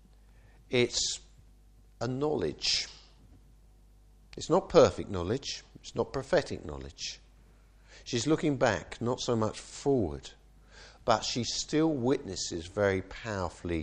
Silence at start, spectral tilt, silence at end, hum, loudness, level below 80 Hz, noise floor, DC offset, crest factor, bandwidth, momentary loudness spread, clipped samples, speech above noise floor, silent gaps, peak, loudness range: 0.7 s; -4.5 dB/octave; 0 s; none; -31 LUFS; -54 dBFS; -58 dBFS; under 0.1%; 24 dB; 10 kHz; 13 LU; under 0.1%; 28 dB; none; -8 dBFS; 4 LU